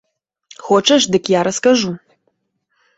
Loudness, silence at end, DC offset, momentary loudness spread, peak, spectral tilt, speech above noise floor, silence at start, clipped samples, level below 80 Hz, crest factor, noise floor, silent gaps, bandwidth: -14 LUFS; 1 s; under 0.1%; 15 LU; -2 dBFS; -3.5 dB/octave; 55 dB; 0.65 s; under 0.1%; -58 dBFS; 16 dB; -69 dBFS; none; 8 kHz